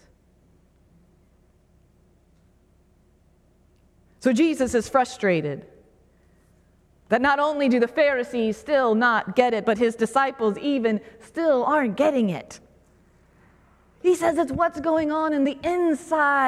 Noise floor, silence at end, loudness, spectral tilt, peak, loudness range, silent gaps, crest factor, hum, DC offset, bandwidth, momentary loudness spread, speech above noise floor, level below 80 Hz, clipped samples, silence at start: -59 dBFS; 0 s; -22 LUFS; -5.5 dB/octave; -4 dBFS; 4 LU; none; 20 dB; none; under 0.1%; 13.5 kHz; 6 LU; 38 dB; -56 dBFS; under 0.1%; 4.2 s